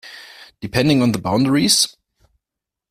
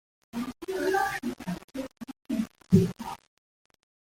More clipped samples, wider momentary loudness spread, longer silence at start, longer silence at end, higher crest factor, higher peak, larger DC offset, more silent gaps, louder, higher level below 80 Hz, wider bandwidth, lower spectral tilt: neither; first, 20 LU vs 17 LU; second, 0.05 s vs 0.35 s; about the same, 1 s vs 1.05 s; second, 18 dB vs 24 dB; first, 0 dBFS vs -8 dBFS; neither; second, none vs 1.64-1.68 s; first, -16 LUFS vs -30 LUFS; first, -50 dBFS vs -56 dBFS; about the same, 15.5 kHz vs 16.5 kHz; second, -4 dB/octave vs -6.5 dB/octave